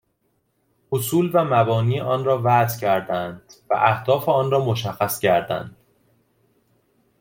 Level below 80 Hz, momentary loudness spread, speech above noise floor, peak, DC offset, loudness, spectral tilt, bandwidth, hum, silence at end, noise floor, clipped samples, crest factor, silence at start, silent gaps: -60 dBFS; 9 LU; 49 dB; -4 dBFS; under 0.1%; -21 LUFS; -6 dB/octave; 17 kHz; none; 1.5 s; -69 dBFS; under 0.1%; 18 dB; 0.9 s; none